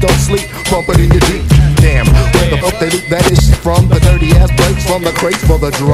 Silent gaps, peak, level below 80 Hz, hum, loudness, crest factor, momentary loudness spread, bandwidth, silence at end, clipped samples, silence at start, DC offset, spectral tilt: none; 0 dBFS; -14 dBFS; none; -10 LUFS; 8 dB; 5 LU; 15.5 kHz; 0 s; 1%; 0 s; under 0.1%; -5.5 dB/octave